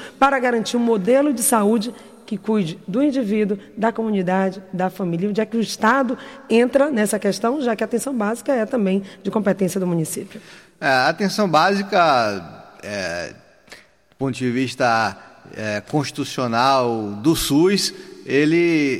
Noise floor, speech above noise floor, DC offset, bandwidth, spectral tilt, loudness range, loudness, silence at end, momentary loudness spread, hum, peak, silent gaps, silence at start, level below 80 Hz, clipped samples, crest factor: -47 dBFS; 27 dB; under 0.1%; 16.5 kHz; -4.5 dB/octave; 4 LU; -20 LUFS; 0 s; 11 LU; none; -4 dBFS; none; 0 s; -52 dBFS; under 0.1%; 16 dB